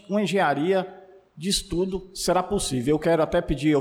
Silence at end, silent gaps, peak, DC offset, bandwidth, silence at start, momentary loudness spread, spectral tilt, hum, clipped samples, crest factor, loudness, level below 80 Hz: 0 s; none; -12 dBFS; under 0.1%; 17 kHz; 0.1 s; 6 LU; -4.5 dB/octave; none; under 0.1%; 12 dB; -24 LUFS; -42 dBFS